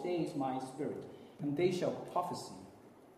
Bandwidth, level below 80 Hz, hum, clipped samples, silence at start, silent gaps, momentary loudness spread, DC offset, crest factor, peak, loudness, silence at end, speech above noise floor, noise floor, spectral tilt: 14 kHz; -76 dBFS; none; under 0.1%; 0 s; none; 17 LU; under 0.1%; 18 dB; -20 dBFS; -38 LUFS; 0 s; 21 dB; -58 dBFS; -6.5 dB/octave